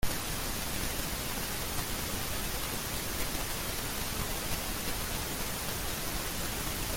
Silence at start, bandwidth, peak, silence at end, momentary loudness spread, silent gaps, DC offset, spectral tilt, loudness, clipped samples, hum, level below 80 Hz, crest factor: 0 s; 17 kHz; -18 dBFS; 0 s; 0 LU; none; under 0.1%; -2.5 dB/octave; -34 LUFS; under 0.1%; none; -42 dBFS; 16 dB